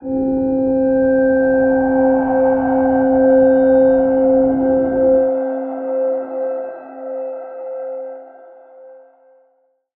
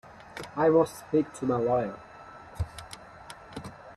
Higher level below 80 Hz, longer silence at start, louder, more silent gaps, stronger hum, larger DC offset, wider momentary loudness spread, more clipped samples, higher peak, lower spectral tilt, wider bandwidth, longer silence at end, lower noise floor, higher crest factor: first, -46 dBFS vs -52 dBFS; about the same, 0 s vs 0.05 s; first, -15 LUFS vs -28 LUFS; neither; neither; neither; second, 16 LU vs 23 LU; neither; first, -2 dBFS vs -12 dBFS; first, -12.5 dB/octave vs -6.5 dB/octave; second, 2.8 kHz vs 13 kHz; first, 1 s vs 0 s; first, -61 dBFS vs -48 dBFS; about the same, 14 dB vs 18 dB